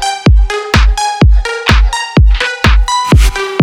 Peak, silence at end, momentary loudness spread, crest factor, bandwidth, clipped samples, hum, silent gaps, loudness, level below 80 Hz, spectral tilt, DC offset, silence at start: 0 dBFS; 0 s; 2 LU; 8 dB; 13 kHz; 0.5%; none; none; -10 LUFS; -10 dBFS; -5 dB/octave; under 0.1%; 0 s